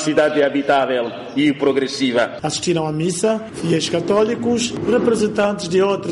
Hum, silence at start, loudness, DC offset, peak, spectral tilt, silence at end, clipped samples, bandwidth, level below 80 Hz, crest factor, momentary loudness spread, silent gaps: none; 0 s; -18 LUFS; under 0.1%; -6 dBFS; -4.5 dB/octave; 0 s; under 0.1%; 11.5 kHz; -52 dBFS; 12 dB; 4 LU; none